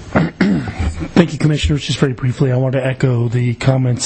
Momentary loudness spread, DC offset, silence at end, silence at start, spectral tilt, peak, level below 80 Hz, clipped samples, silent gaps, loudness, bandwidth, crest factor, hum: 3 LU; under 0.1%; 0 s; 0 s; -6.5 dB/octave; 0 dBFS; -30 dBFS; under 0.1%; none; -16 LUFS; 8.8 kHz; 14 dB; none